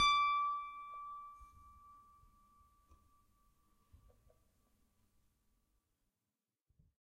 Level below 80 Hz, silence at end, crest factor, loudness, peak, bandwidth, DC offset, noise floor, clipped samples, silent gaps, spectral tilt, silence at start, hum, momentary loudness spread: -68 dBFS; 5.1 s; 22 dB; -37 LUFS; -20 dBFS; 10.5 kHz; under 0.1%; under -90 dBFS; under 0.1%; none; 1 dB/octave; 0 s; none; 23 LU